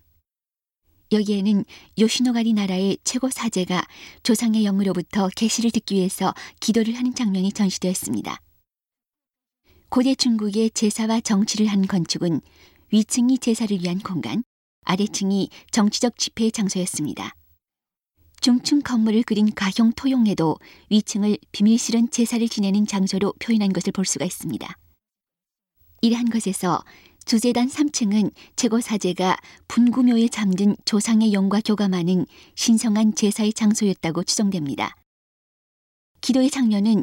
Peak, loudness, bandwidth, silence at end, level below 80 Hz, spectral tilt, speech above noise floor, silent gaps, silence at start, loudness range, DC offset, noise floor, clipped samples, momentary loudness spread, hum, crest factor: -4 dBFS; -21 LUFS; 16.5 kHz; 0 s; -60 dBFS; -4.5 dB/octave; over 69 dB; 14.46-14.82 s, 35.06-36.15 s; 1.1 s; 4 LU; under 0.1%; under -90 dBFS; under 0.1%; 8 LU; none; 18 dB